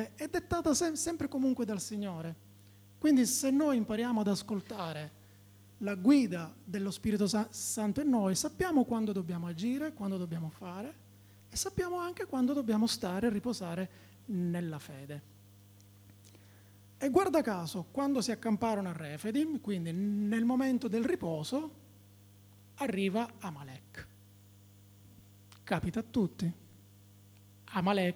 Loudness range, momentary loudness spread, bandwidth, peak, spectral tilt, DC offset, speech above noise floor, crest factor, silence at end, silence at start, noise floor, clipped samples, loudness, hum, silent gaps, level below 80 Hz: 8 LU; 15 LU; over 20 kHz; -12 dBFS; -5 dB/octave; under 0.1%; 26 dB; 20 dB; 0 s; 0 s; -58 dBFS; under 0.1%; -33 LUFS; 50 Hz at -60 dBFS; none; -62 dBFS